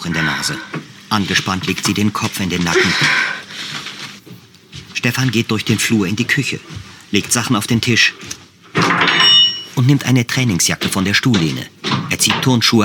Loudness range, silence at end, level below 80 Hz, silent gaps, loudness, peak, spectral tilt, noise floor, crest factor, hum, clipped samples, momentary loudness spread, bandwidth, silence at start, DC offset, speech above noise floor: 6 LU; 0 s; -50 dBFS; none; -15 LUFS; 0 dBFS; -3.5 dB/octave; -40 dBFS; 16 dB; none; under 0.1%; 14 LU; 19 kHz; 0 s; under 0.1%; 24 dB